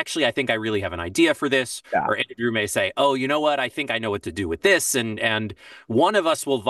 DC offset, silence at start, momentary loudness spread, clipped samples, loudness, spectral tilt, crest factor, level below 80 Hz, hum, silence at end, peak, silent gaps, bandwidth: under 0.1%; 0 s; 8 LU; under 0.1%; -22 LUFS; -3.5 dB/octave; 18 dB; -54 dBFS; none; 0 s; -6 dBFS; none; 12.5 kHz